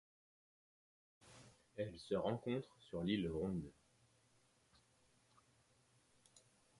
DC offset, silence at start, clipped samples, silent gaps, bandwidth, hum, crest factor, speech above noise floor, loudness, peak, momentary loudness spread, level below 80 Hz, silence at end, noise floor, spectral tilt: under 0.1%; 1.25 s; under 0.1%; none; 11.5 kHz; none; 20 dB; 33 dB; -44 LUFS; -26 dBFS; 22 LU; -68 dBFS; 0.4 s; -76 dBFS; -7 dB/octave